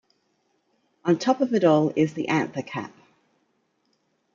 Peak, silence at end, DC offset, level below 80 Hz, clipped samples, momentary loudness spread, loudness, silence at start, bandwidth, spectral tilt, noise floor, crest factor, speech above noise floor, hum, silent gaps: -6 dBFS; 1.45 s; under 0.1%; -72 dBFS; under 0.1%; 14 LU; -23 LUFS; 1.05 s; 7.4 kHz; -6.5 dB/octave; -70 dBFS; 20 dB; 48 dB; none; none